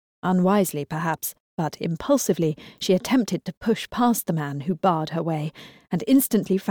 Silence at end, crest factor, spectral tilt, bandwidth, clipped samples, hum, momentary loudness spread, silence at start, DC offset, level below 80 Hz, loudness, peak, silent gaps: 0 s; 16 dB; -5.5 dB/octave; over 20 kHz; under 0.1%; none; 10 LU; 0.25 s; under 0.1%; -58 dBFS; -24 LUFS; -8 dBFS; 1.40-1.58 s, 3.57-3.61 s